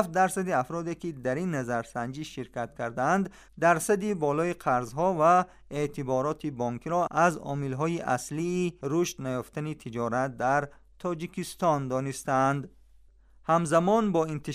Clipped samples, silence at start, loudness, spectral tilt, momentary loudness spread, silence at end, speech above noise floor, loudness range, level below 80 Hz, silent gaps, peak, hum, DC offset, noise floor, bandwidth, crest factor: under 0.1%; 0 s; -28 LUFS; -6 dB/octave; 11 LU; 0 s; 29 dB; 4 LU; -58 dBFS; none; -8 dBFS; none; under 0.1%; -57 dBFS; 15.5 kHz; 20 dB